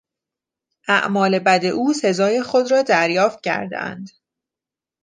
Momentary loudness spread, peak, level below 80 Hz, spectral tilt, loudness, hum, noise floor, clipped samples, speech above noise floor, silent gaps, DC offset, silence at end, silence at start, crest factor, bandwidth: 12 LU; -2 dBFS; -70 dBFS; -4.5 dB/octave; -18 LUFS; none; -89 dBFS; under 0.1%; 71 dB; none; under 0.1%; 0.95 s; 0.9 s; 18 dB; 9.8 kHz